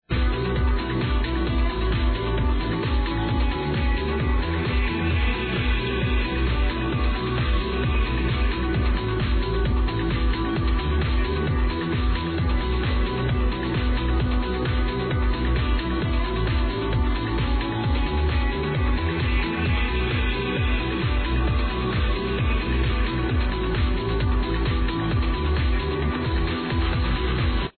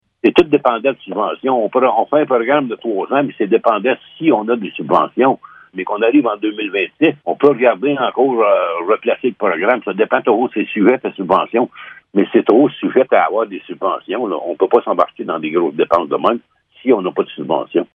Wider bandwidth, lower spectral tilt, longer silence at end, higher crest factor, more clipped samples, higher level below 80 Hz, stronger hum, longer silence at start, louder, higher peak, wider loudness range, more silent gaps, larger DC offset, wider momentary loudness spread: second, 4.5 kHz vs 5.8 kHz; first, -10 dB/octave vs -8 dB/octave; about the same, 0.1 s vs 0.1 s; second, 10 dB vs 16 dB; neither; first, -24 dBFS vs -60 dBFS; neither; second, 0.1 s vs 0.25 s; second, -24 LUFS vs -16 LUFS; second, -12 dBFS vs 0 dBFS; about the same, 0 LU vs 2 LU; neither; neither; second, 1 LU vs 8 LU